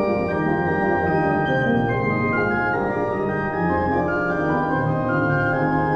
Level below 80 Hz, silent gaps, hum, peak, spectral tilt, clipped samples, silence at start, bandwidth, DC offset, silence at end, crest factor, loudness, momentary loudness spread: -44 dBFS; none; none; -8 dBFS; -9 dB/octave; under 0.1%; 0 s; 6.8 kHz; under 0.1%; 0 s; 12 dB; -21 LUFS; 3 LU